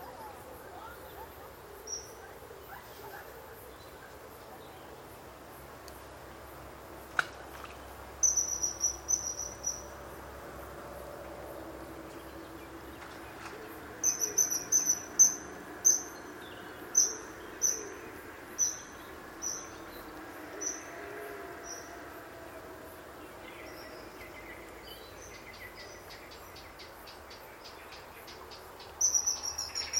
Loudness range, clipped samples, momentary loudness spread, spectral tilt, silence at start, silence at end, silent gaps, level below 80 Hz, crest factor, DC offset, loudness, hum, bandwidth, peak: 20 LU; under 0.1%; 22 LU; -0.5 dB/octave; 0 s; 0 s; none; -60 dBFS; 26 dB; under 0.1%; -30 LUFS; none; 17 kHz; -10 dBFS